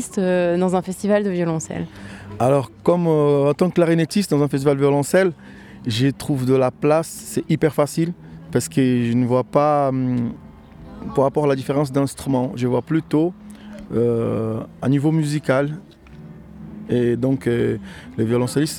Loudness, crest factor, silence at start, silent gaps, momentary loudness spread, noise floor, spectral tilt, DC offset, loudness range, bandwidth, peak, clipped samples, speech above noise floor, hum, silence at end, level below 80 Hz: -20 LUFS; 16 dB; 0 s; none; 14 LU; -40 dBFS; -6.5 dB/octave; under 0.1%; 4 LU; 18 kHz; -2 dBFS; under 0.1%; 21 dB; none; 0 s; -50 dBFS